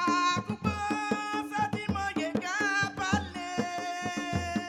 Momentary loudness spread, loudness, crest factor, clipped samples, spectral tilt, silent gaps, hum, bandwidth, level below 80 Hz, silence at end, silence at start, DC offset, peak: 6 LU; -31 LUFS; 18 dB; under 0.1%; -4.5 dB/octave; none; none; 16 kHz; -52 dBFS; 0 s; 0 s; under 0.1%; -12 dBFS